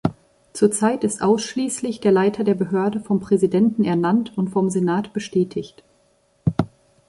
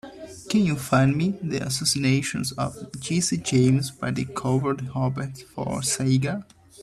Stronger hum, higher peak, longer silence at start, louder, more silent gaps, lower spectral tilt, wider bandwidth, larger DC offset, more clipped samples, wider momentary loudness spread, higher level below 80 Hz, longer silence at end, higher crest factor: neither; first, -2 dBFS vs -8 dBFS; about the same, 0.05 s vs 0.05 s; first, -21 LUFS vs -24 LUFS; neither; about the same, -6 dB/octave vs -5 dB/octave; second, 11.5 kHz vs 13.5 kHz; neither; neither; second, 8 LU vs 11 LU; about the same, -52 dBFS vs -54 dBFS; first, 0.4 s vs 0 s; about the same, 18 dB vs 18 dB